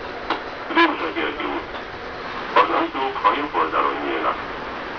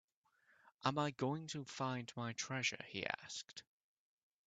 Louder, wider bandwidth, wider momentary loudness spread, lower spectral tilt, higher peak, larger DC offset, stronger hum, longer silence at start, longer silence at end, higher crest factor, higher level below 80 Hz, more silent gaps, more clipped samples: first, -22 LUFS vs -42 LUFS; second, 5.4 kHz vs 9 kHz; about the same, 12 LU vs 10 LU; about the same, -5 dB/octave vs -4 dB/octave; first, -2 dBFS vs -20 dBFS; first, 0.1% vs under 0.1%; neither; second, 0 s vs 0.85 s; second, 0 s vs 0.85 s; second, 20 dB vs 26 dB; first, -48 dBFS vs -82 dBFS; neither; neither